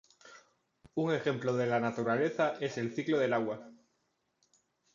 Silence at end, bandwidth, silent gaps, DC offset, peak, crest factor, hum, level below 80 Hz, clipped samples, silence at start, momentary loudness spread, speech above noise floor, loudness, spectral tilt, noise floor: 1.2 s; 7.6 kHz; none; under 0.1%; -16 dBFS; 18 dB; none; -78 dBFS; under 0.1%; 0.25 s; 6 LU; 47 dB; -32 LUFS; -6.5 dB/octave; -79 dBFS